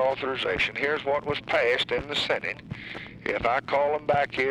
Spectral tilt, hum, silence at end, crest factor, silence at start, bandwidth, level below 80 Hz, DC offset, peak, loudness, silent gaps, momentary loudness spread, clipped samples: -4.5 dB/octave; none; 0 s; 16 dB; 0 s; 12 kHz; -52 dBFS; under 0.1%; -12 dBFS; -26 LUFS; none; 10 LU; under 0.1%